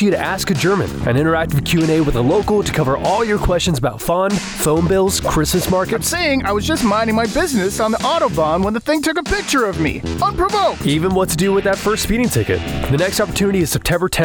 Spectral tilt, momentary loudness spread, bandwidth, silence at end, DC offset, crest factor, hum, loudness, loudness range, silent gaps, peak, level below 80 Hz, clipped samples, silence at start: -5 dB/octave; 3 LU; over 20 kHz; 0 s; under 0.1%; 10 dB; none; -16 LUFS; 1 LU; none; -6 dBFS; -32 dBFS; under 0.1%; 0 s